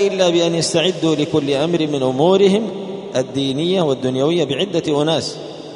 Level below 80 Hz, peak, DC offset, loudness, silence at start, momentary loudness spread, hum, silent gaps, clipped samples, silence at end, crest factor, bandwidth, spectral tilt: -58 dBFS; -2 dBFS; under 0.1%; -17 LUFS; 0 s; 8 LU; none; none; under 0.1%; 0 s; 16 dB; 11 kHz; -5 dB/octave